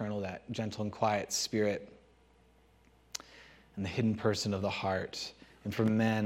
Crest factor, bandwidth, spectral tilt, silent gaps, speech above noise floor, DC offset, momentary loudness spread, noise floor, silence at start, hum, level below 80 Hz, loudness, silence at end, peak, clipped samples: 18 dB; 16 kHz; -5 dB/octave; none; 32 dB; under 0.1%; 14 LU; -64 dBFS; 0 s; none; -66 dBFS; -34 LUFS; 0 s; -16 dBFS; under 0.1%